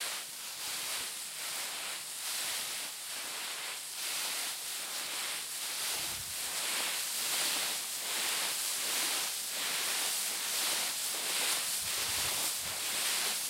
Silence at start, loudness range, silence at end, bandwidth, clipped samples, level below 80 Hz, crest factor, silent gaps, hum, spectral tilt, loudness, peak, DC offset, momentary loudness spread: 0 s; 5 LU; 0 s; 16 kHz; under 0.1%; -72 dBFS; 18 dB; none; none; 1.5 dB/octave; -33 LUFS; -18 dBFS; under 0.1%; 7 LU